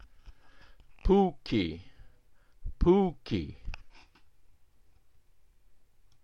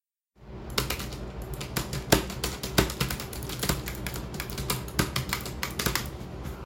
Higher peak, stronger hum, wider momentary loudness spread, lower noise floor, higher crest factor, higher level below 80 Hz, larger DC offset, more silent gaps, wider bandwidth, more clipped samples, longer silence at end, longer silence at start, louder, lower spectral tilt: second, -12 dBFS vs -4 dBFS; neither; first, 23 LU vs 13 LU; first, -64 dBFS vs -53 dBFS; second, 22 dB vs 28 dB; about the same, -42 dBFS vs -40 dBFS; first, 0.1% vs under 0.1%; neither; second, 7 kHz vs 17 kHz; neither; first, 2.35 s vs 0 s; second, 0.25 s vs 0.4 s; about the same, -29 LUFS vs -30 LUFS; first, -8.5 dB/octave vs -3.5 dB/octave